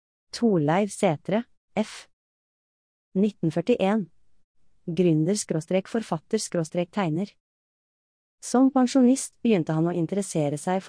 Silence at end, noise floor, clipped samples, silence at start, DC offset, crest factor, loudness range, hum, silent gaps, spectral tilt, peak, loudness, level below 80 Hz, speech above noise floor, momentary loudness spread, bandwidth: 0 s; under -90 dBFS; under 0.1%; 0.35 s; under 0.1%; 16 dB; 4 LU; none; 1.57-1.68 s, 2.13-3.12 s, 4.44-4.55 s, 7.40-8.38 s; -6 dB/octave; -10 dBFS; -25 LUFS; -68 dBFS; over 66 dB; 12 LU; 10.5 kHz